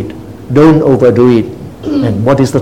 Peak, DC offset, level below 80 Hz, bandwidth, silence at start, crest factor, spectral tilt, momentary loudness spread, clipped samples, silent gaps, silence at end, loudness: 0 dBFS; 0.8%; -38 dBFS; 15 kHz; 0 s; 10 dB; -8 dB/octave; 16 LU; 1%; none; 0 s; -9 LUFS